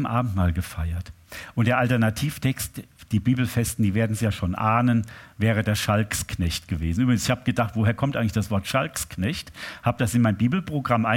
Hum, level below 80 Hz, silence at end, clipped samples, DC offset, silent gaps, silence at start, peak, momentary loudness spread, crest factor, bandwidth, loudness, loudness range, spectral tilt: none; -42 dBFS; 0 s; under 0.1%; under 0.1%; none; 0 s; -4 dBFS; 9 LU; 18 dB; 17 kHz; -24 LUFS; 1 LU; -5.5 dB/octave